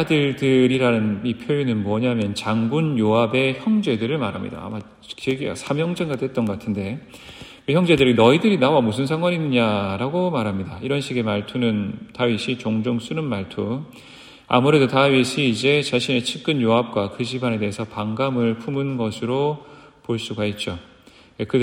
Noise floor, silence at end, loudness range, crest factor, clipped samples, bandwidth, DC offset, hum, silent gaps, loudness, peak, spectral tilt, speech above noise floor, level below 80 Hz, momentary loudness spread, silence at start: -46 dBFS; 0 s; 6 LU; 20 dB; under 0.1%; 15.5 kHz; under 0.1%; none; none; -21 LUFS; -2 dBFS; -6 dB/octave; 25 dB; -56 dBFS; 12 LU; 0 s